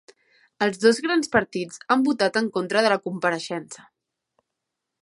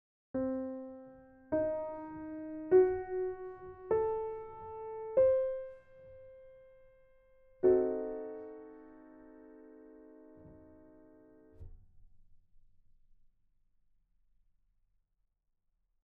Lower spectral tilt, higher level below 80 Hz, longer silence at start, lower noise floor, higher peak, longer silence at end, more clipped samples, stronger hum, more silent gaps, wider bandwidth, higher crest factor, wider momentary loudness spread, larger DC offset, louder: second, -4 dB/octave vs -9 dB/octave; about the same, -64 dBFS vs -64 dBFS; first, 0.6 s vs 0.35 s; about the same, -83 dBFS vs -80 dBFS; first, -2 dBFS vs -16 dBFS; second, 1.25 s vs 3.7 s; neither; neither; neither; first, 11.5 kHz vs 2.8 kHz; about the same, 22 dB vs 22 dB; second, 12 LU vs 27 LU; neither; first, -23 LUFS vs -34 LUFS